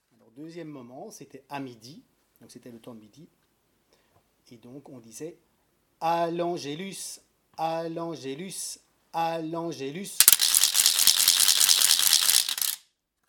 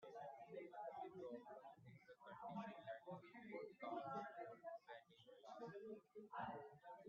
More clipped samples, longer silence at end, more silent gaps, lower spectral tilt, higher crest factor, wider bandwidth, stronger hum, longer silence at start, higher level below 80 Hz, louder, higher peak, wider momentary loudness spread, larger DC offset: neither; first, 0.5 s vs 0 s; neither; second, 0 dB/octave vs -4.5 dB/octave; first, 28 dB vs 18 dB; first, 19 kHz vs 7 kHz; neither; first, 0.35 s vs 0 s; first, -72 dBFS vs under -90 dBFS; first, -21 LUFS vs -56 LUFS; first, 0 dBFS vs -38 dBFS; first, 24 LU vs 10 LU; neither